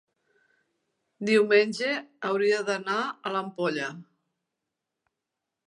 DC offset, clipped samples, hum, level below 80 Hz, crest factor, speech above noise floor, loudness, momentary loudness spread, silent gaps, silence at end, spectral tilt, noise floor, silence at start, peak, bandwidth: under 0.1%; under 0.1%; none; -82 dBFS; 22 dB; 60 dB; -26 LUFS; 10 LU; none; 1.65 s; -4.5 dB/octave; -86 dBFS; 1.2 s; -8 dBFS; 11 kHz